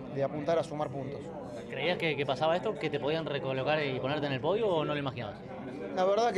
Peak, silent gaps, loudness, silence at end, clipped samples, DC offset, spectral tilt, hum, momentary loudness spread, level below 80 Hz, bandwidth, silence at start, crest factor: -16 dBFS; none; -32 LUFS; 0 s; under 0.1%; under 0.1%; -6 dB/octave; none; 11 LU; -64 dBFS; 11.5 kHz; 0 s; 16 dB